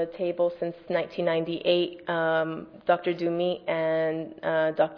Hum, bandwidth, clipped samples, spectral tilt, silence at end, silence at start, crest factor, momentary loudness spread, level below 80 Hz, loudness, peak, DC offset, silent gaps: none; 5.4 kHz; under 0.1%; -8 dB/octave; 0 s; 0 s; 18 dB; 5 LU; -68 dBFS; -27 LUFS; -10 dBFS; under 0.1%; none